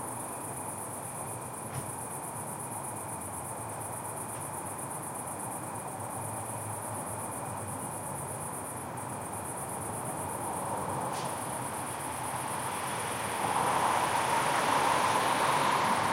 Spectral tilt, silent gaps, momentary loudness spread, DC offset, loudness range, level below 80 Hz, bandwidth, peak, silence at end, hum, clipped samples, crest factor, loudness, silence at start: -3 dB/octave; none; 10 LU; under 0.1%; 8 LU; -64 dBFS; 16 kHz; -14 dBFS; 0 s; none; under 0.1%; 20 dB; -33 LUFS; 0 s